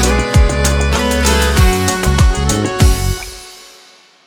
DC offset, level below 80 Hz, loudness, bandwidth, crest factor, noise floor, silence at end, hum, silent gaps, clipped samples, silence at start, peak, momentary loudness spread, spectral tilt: under 0.1%; -16 dBFS; -13 LUFS; 20 kHz; 12 dB; -44 dBFS; 0.7 s; none; none; under 0.1%; 0 s; 0 dBFS; 10 LU; -4.5 dB/octave